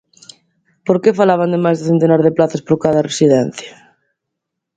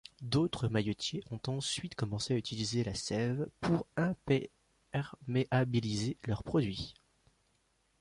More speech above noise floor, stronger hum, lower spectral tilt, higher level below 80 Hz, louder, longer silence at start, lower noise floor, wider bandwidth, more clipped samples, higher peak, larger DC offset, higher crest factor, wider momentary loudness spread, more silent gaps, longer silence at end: first, 64 dB vs 41 dB; neither; about the same, -6.5 dB/octave vs -5.5 dB/octave; about the same, -56 dBFS vs -58 dBFS; first, -14 LUFS vs -35 LUFS; first, 0.85 s vs 0.2 s; about the same, -78 dBFS vs -75 dBFS; second, 9.4 kHz vs 11.5 kHz; neither; first, 0 dBFS vs -18 dBFS; neither; about the same, 16 dB vs 16 dB; first, 10 LU vs 7 LU; neither; about the same, 1.05 s vs 1.1 s